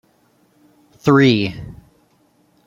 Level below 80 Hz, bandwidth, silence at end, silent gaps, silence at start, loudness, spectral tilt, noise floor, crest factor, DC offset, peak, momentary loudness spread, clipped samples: -50 dBFS; 12 kHz; 0.95 s; none; 1.05 s; -15 LUFS; -7 dB/octave; -58 dBFS; 18 dB; under 0.1%; -2 dBFS; 23 LU; under 0.1%